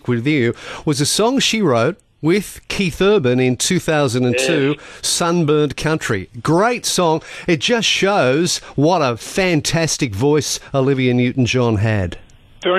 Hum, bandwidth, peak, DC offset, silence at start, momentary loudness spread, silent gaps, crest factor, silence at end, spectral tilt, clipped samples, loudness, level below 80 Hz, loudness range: none; 13.5 kHz; -4 dBFS; under 0.1%; 0.05 s; 6 LU; none; 12 dB; 0 s; -4.5 dB/octave; under 0.1%; -17 LUFS; -44 dBFS; 1 LU